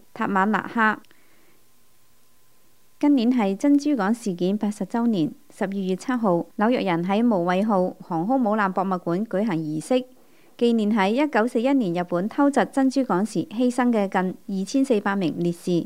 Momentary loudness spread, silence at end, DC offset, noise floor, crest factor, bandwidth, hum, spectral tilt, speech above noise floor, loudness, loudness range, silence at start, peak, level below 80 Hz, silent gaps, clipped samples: 6 LU; 0 s; 0.3%; -62 dBFS; 16 dB; 15.5 kHz; none; -6.5 dB/octave; 40 dB; -23 LUFS; 2 LU; 0.15 s; -6 dBFS; -72 dBFS; none; under 0.1%